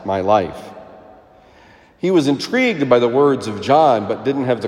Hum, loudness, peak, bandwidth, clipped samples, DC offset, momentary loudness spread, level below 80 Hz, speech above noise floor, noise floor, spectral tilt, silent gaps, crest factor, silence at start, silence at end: none; -16 LUFS; 0 dBFS; 12.5 kHz; under 0.1%; under 0.1%; 10 LU; -58 dBFS; 31 dB; -47 dBFS; -6 dB/octave; none; 16 dB; 0 s; 0 s